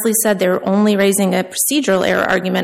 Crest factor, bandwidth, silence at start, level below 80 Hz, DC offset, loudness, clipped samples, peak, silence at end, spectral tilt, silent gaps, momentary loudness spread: 12 dB; 16 kHz; 0 s; -54 dBFS; under 0.1%; -15 LUFS; under 0.1%; -2 dBFS; 0 s; -4 dB/octave; none; 3 LU